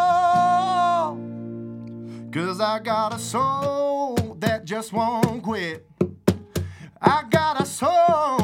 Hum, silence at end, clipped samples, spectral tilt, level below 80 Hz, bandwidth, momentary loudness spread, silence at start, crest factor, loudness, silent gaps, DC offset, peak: none; 0 s; under 0.1%; -5.5 dB/octave; -54 dBFS; 16.5 kHz; 16 LU; 0 s; 20 dB; -22 LUFS; none; under 0.1%; -2 dBFS